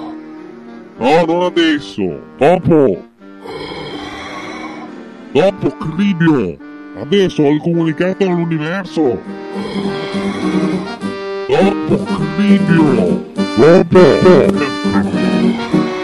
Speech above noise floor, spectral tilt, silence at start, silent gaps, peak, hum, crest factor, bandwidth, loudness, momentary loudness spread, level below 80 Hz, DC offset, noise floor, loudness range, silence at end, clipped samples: 21 dB; -7 dB/octave; 0 s; none; 0 dBFS; none; 14 dB; 11.5 kHz; -13 LUFS; 19 LU; -44 dBFS; under 0.1%; -33 dBFS; 7 LU; 0 s; under 0.1%